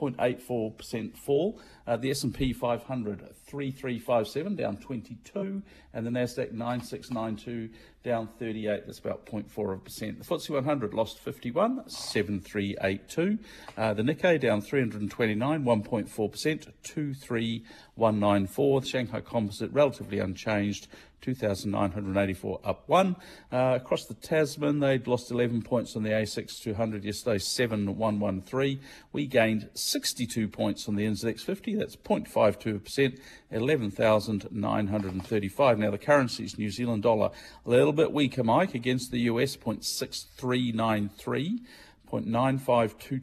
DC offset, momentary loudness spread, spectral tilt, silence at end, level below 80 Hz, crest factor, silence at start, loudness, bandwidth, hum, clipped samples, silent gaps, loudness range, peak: under 0.1%; 11 LU; -5.5 dB/octave; 0 s; -58 dBFS; 18 dB; 0 s; -29 LUFS; 14.5 kHz; none; under 0.1%; none; 6 LU; -10 dBFS